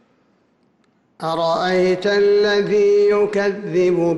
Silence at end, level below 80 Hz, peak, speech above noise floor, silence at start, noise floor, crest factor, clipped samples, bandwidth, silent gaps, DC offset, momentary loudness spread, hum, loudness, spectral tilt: 0 s; -58 dBFS; -8 dBFS; 44 dB; 1.2 s; -61 dBFS; 10 dB; under 0.1%; 11.5 kHz; none; under 0.1%; 6 LU; none; -17 LUFS; -6 dB/octave